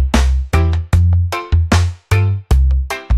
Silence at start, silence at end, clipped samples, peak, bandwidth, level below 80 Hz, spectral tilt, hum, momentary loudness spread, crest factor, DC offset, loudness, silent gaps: 0 s; 0 s; under 0.1%; 0 dBFS; 13.5 kHz; -18 dBFS; -6 dB/octave; none; 3 LU; 12 dB; under 0.1%; -15 LUFS; none